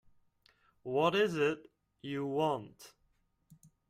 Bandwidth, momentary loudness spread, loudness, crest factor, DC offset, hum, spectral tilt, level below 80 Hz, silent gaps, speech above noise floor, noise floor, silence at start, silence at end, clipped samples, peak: 14.5 kHz; 20 LU; -33 LUFS; 20 dB; under 0.1%; none; -5.5 dB/octave; -74 dBFS; none; 42 dB; -75 dBFS; 0.85 s; 1 s; under 0.1%; -16 dBFS